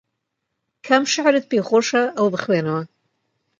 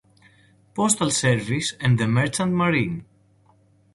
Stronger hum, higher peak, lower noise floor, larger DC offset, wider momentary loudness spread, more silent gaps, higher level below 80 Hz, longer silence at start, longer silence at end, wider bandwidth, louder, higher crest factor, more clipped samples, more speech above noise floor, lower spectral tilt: neither; first, 0 dBFS vs -4 dBFS; first, -77 dBFS vs -58 dBFS; neither; about the same, 7 LU vs 8 LU; neither; second, -70 dBFS vs -54 dBFS; about the same, 0.85 s vs 0.75 s; second, 0.75 s vs 0.9 s; second, 9.2 kHz vs 12 kHz; first, -19 LUFS vs -22 LUFS; about the same, 20 dB vs 20 dB; neither; first, 59 dB vs 37 dB; about the same, -4 dB/octave vs -4.5 dB/octave